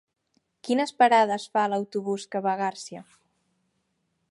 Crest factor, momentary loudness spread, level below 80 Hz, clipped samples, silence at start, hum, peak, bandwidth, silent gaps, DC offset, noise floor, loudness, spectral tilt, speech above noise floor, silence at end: 20 dB; 21 LU; -82 dBFS; under 0.1%; 0.65 s; none; -8 dBFS; 11.5 kHz; none; under 0.1%; -75 dBFS; -25 LUFS; -4.5 dB/octave; 50 dB; 1.3 s